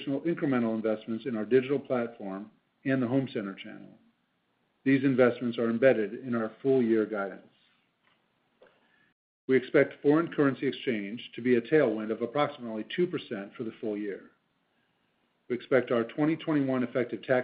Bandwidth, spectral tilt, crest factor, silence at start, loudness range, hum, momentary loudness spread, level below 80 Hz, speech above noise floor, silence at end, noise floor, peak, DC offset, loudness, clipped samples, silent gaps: 4.9 kHz; -5.5 dB/octave; 20 dB; 0 s; 6 LU; none; 13 LU; -78 dBFS; 46 dB; 0 s; -74 dBFS; -10 dBFS; under 0.1%; -29 LUFS; under 0.1%; 9.12-9.48 s